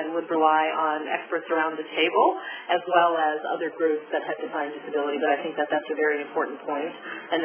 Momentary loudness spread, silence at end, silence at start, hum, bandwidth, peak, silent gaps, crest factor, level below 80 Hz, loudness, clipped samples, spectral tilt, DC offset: 10 LU; 0 s; 0 s; none; 3.5 kHz; -6 dBFS; none; 20 dB; -86 dBFS; -25 LUFS; under 0.1%; -7 dB/octave; under 0.1%